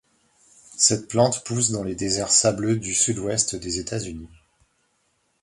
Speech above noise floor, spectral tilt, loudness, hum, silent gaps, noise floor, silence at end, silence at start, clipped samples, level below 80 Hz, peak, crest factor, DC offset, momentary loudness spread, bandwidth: 46 dB; -3 dB/octave; -21 LUFS; none; none; -69 dBFS; 1.15 s; 0.7 s; under 0.1%; -52 dBFS; -4 dBFS; 22 dB; under 0.1%; 12 LU; 11.5 kHz